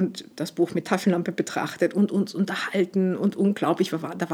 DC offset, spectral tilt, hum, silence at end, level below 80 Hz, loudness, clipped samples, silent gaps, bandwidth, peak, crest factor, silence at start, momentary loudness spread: under 0.1%; -6 dB/octave; none; 0 s; -76 dBFS; -25 LUFS; under 0.1%; none; 16 kHz; -6 dBFS; 20 dB; 0 s; 5 LU